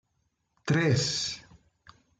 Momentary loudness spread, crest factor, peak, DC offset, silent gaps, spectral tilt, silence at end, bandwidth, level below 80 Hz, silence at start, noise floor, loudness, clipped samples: 16 LU; 16 dB; -14 dBFS; under 0.1%; none; -4.5 dB/octave; 0.8 s; 9.4 kHz; -62 dBFS; 0.65 s; -76 dBFS; -27 LUFS; under 0.1%